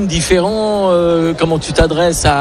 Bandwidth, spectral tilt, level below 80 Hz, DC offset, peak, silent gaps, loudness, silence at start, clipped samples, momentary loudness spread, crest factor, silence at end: 13.5 kHz; -4.5 dB/octave; -26 dBFS; under 0.1%; 0 dBFS; none; -13 LUFS; 0 s; under 0.1%; 2 LU; 12 dB; 0 s